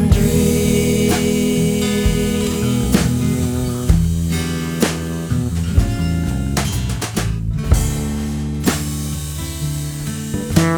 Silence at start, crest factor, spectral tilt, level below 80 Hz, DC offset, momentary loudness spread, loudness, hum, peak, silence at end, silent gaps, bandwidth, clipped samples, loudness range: 0 s; 16 dB; -5.5 dB/octave; -24 dBFS; under 0.1%; 8 LU; -18 LUFS; none; 0 dBFS; 0 s; none; over 20 kHz; under 0.1%; 4 LU